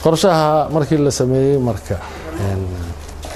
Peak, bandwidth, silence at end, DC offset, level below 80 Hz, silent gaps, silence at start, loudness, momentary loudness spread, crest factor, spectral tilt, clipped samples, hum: 0 dBFS; 13.5 kHz; 0 s; under 0.1%; -36 dBFS; none; 0 s; -17 LUFS; 15 LU; 16 dB; -6 dB/octave; under 0.1%; none